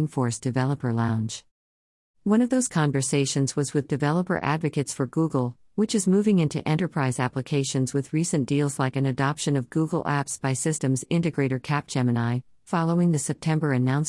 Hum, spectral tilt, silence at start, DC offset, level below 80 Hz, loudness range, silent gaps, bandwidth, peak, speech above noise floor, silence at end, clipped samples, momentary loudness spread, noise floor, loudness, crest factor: none; -5.5 dB/octave; 0 s; under 0.1%; -62 dBFS; 1 LU; 1.51-2.14 s; 12 kHz; -10 dBFS; over 66 dB; 0 s; under 0.1%; 5 LU; under -90 dBFS; -25 LUFS; 16 dB